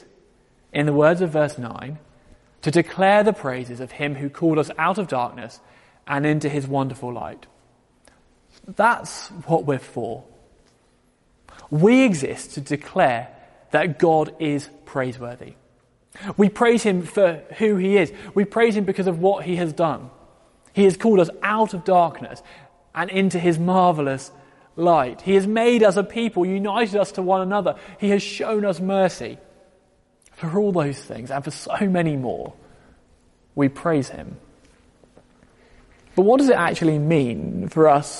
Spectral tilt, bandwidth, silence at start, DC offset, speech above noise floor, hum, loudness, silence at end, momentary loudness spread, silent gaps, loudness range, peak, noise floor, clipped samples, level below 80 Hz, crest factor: -6.5 dB/octave; 11.5 kHz; 0.75 s; under 0.1%; 40 dB; none; -21 LUFS; 0 s; 16 LU; none; 6 LU; -2 dBFS; -61 dBFS; under 0.1%; -58 dBFS; 18 dB